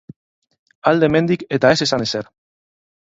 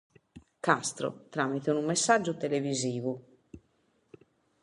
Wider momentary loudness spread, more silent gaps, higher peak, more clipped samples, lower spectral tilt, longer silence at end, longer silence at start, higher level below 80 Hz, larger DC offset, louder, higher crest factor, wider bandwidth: about the same, 10 LU vs 10 LU; neither; first, 0 dBFS vs -8 dBFS; neither; about the same, -5 dB/octave vs -4 dB/octave; second, 0.9 s vs 1.05 s; first, 0.85 s vs 0.35 s; first, -54 dBFS vs -70 dBFS; neither; first, -17 LUFS vs -30 LUFS; about the same, 20 dB vs 24 dB; second, 8 kHz vs 11.5 kHz